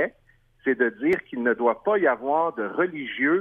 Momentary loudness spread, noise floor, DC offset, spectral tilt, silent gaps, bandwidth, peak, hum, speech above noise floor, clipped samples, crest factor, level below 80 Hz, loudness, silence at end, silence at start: 5 LU; -60 dBFS; under 0.1%; -7.5 dB/octave; none; 4.8 kHz; -8 dBFS; none; 37 dB; under 0.1%; 16 dB; -66 dBFS; -24 LUFS; 0 s; 0 s